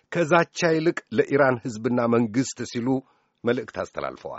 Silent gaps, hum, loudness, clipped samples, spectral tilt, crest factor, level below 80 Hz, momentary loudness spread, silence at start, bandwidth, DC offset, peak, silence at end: none; none; -24 LUFS; under 0.1%; -5 dB/octave; 22 dB; -62 dBFS; 10 LU; 0.1 s; 8 kHz; under 0.1%; -2 dBFS; 0 s